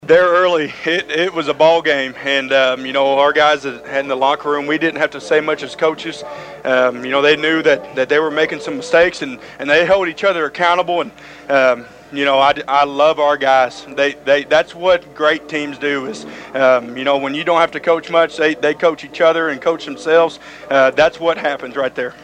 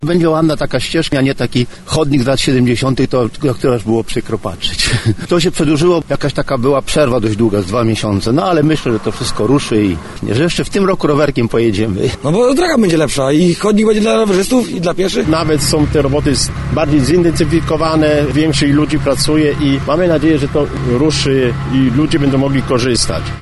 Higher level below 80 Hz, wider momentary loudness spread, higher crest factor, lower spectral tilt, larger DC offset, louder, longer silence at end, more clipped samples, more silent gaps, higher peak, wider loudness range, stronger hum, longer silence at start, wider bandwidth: second, -54 dBFS vs -30 dBFS; first, 9 LU vs 5 LU; about the same, 16 dB vs 12 dB; second, -4 dB/octave vs -5.5 dB/octave; neither; about the same, -15 LUFS vs -13 LUFS; about the same, 0.1 s vs 0 s; neither; neither; about the same, 0 dBFS vs -2 dBFS; about the same, 2 LU vs 2 LU; neither; about the same, 0.05 s vs 0 s; second, 9.8 kHz vs 12 kHz